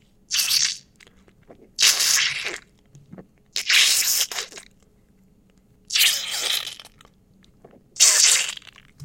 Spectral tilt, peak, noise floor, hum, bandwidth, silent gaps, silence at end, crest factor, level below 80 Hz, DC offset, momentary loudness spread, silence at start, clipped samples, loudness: 3 dB/octave; 0 dBFS; -57 dBFS; none; 17 kHz; none; 0 s; 24 dB; -62 dBFS; under 0.1%; 19 LU; 0.3 s; under 0.1%; -18 LUFS